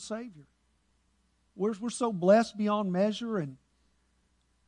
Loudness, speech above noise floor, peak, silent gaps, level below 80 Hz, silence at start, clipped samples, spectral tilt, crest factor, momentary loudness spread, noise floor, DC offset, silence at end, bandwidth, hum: -29 LUFS; 43 dB; -10 dBFS; none; -72 dBFS; 0 s; under 0.1%; -6 dB/octave; 20 dB; 16 LU; -71 dBFS; under 0.1%; 1.15 s; 11 kHz; none